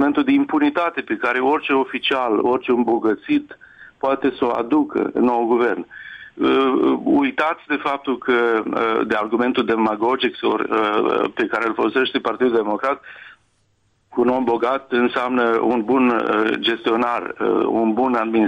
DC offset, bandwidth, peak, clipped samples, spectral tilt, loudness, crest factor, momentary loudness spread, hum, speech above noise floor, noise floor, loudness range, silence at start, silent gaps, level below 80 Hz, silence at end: under 0.1%; 8.2 kHz; -6 dBFS; under 0.1%; -6.5 dB/octave; -19 LUFS; 12 dB; 5 LU; none; 45 dB; -64 dBFS; 2 LU; 0 s; none; -60 dBFS; 0 s